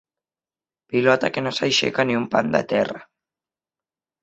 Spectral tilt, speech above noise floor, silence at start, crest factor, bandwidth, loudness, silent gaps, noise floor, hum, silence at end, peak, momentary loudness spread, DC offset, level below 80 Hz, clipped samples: -4.5 dB/octave; over 69 dB; 0.9 s; 22 dB; 8.2 kHz; -21 LUFS; none; under -90 dBFS; none; 1.2 s; -2 dBFS; 6 LU; under 0.1%; -62 dBFS; under 0.1%